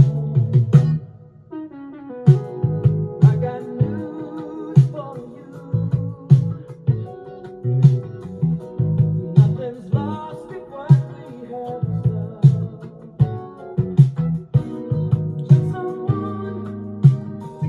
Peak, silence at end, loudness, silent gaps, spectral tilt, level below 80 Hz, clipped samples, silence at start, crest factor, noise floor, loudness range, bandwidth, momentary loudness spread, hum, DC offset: -2 dBFS; 0 s; -19 LUFS; none; -10.5 dB/octave; -50 dBFS; under 0.1%; 0 s; 18 dB; -41 dBFS; 2 LU; 4.1 kHz; 18 LU; none; under 0.1%